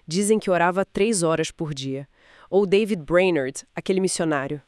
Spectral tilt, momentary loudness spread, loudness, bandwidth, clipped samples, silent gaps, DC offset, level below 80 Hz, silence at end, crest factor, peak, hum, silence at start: -4.5 dB/octave; 10 LU; -22 LUFS; 12 kHz; under 0.1%; none; under 0.1%; -54 dBFS; 0.1 s; 16 dB; -6 dBFS; none; 0.1 s